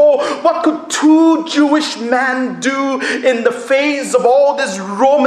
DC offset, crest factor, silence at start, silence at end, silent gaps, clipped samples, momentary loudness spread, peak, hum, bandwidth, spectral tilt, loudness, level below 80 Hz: under 0.1%; 12 dB; 0 s; 0 s; none; under 0.1%; 6 LU; 0 dBFS; none; 12.5 kHz; -3.5 dB/octave; -13 LUFS; -66 dBFS